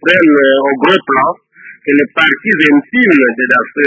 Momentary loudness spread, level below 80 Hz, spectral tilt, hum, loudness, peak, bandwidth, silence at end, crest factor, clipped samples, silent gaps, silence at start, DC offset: 5 LU; -56 dBFS; -6 dB/octave; none; -10 LUFS; 0 dBFS; 8 kHz; 0 s; 10 dB; 0.2%; none; 0.05 s; under 0.1%